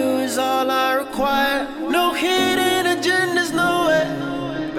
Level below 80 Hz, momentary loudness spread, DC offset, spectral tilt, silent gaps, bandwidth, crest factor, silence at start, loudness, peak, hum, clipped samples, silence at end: -48 dBFS; 6 LU; under 0.1%; -3.5 dB/octave; none; 18 kHz; 14 dB; 0 s; -19 LUFS; -6 dBFS; none; under 0.1%; 0 s